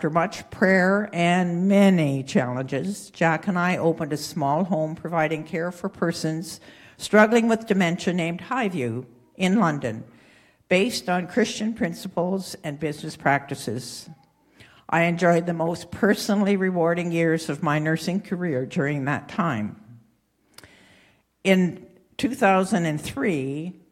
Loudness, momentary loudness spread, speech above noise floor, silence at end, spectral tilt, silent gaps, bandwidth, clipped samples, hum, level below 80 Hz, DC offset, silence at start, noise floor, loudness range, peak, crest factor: -23 LUFS; 11 LU; 42 dB; 0.2 s; -6 dB/octave; none; 15 kHz; under 0.1%; none; -62 dBFS; under 0.1%; 0 s; -64 dBFS; 5 LU; -2 dBFS; 22 dB